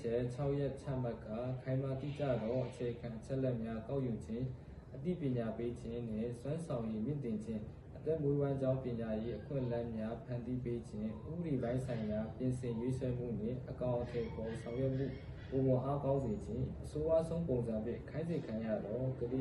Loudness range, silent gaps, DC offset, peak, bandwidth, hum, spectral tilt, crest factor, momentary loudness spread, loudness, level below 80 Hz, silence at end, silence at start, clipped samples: 3 LU; none; under 0.1%; -22 dBFS; 11 kHz; none; -9 dB/octave; 16 dB; 7 LU; -39 LUFS; -56 dBFS; 0 s; 0 s; under 0.1%